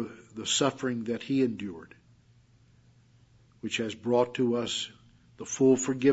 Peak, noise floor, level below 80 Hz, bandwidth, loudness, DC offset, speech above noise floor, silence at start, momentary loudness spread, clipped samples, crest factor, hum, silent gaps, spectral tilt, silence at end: -10 dBFS; -61 dBFS; -70 dBFS; 8 kHz; -29 LUFS; under 0.1%; 33 dB; 0 s; 15 LU; under 0.1%; 20 dB; none; none; -4 dB/octave; 0 s